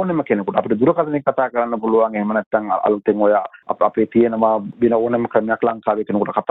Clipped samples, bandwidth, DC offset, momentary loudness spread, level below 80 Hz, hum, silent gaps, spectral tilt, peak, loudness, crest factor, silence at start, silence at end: under 0.1%; 4 kHz; under 0.1%; 4 LU; -58 dBFS; none; 2.46-2.51 s; -10.5 dB/octave; -2 dBFS; -18 LUFS; 16 dB; 0 s; 0.1 s